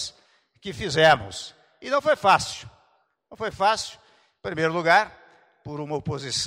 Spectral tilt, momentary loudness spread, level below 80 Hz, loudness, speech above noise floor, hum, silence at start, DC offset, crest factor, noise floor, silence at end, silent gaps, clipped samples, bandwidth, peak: -3.5 dB/octave; 19 LU; -56 dBFS; -23 LUFS; 43 dB; none; 0 s; under 0.1%; 20 dB; -66 dBFS; 0 s; none; under 0.1%; 16 kHz; -6 dBFS